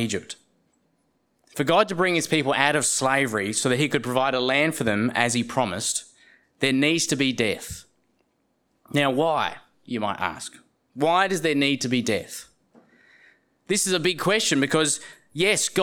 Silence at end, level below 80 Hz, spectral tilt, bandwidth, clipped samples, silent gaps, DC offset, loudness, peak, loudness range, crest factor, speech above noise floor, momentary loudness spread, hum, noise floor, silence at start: 0 s; -62 dBFS; -3 dB/octave; 19 kHz; under 0.1%; none; under 0.1%; -23 LUFS; -2 dBFS; 4 LU; 22 dB; 47 dB; 10 LU; none; -70 dBFS; 0 s